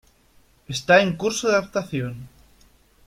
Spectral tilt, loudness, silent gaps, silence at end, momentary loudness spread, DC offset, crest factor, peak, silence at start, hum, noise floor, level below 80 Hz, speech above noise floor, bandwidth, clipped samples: -4 dB/octave; -21 LUFS; none; 0.8 s; 15 LU; under 0.1%; 20 dB; -4 dBFS; 0.7 s; none; -57 dBFS; -56 dBFS; 36 dB; 16 kHz; under 0.1%